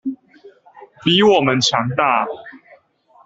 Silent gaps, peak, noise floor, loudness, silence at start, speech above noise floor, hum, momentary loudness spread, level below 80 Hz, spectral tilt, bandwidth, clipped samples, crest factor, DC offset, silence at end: none; -2 dBFS; -53 dBFS; -16 LUFS; 0.05 s; 37 dB; none; 18 LU; -58 dBFS; -4.5 dB/octave; 8 kHz; under 0.1%; 18 dB; under 0.1%; 0.7 s